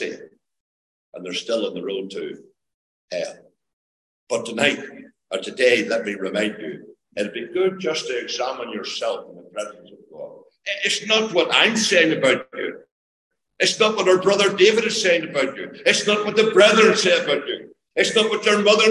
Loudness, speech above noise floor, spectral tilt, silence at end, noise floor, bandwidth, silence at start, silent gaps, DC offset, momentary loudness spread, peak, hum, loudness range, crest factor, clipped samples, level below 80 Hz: -19 LUFS; over 70 dB; -2.5 dB/octave; 0 s; under -90 dBFS; 12 kHz; 0 s; 0.60-1.12 s, 2.74-3.08 s, 3.73-4.27 s, 12.91-13.31 s; under 0.1%; 17 LU; 0 dBFS; none; 13 LU; 22 dB; under 0.1%; -68 dBFS